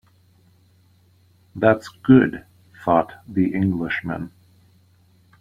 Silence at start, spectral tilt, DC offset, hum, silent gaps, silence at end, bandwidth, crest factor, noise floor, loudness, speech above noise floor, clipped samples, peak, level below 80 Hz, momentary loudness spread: 1.55 s; -8.5 dB/octave; under 0.1%; none; none; 1.15 s; 7.6 kHz; 20 dB; -57 dBFS; -20 LUFS; 38 dB; under 0.1%; -2 dBFS; -54 dBFS; 17 LU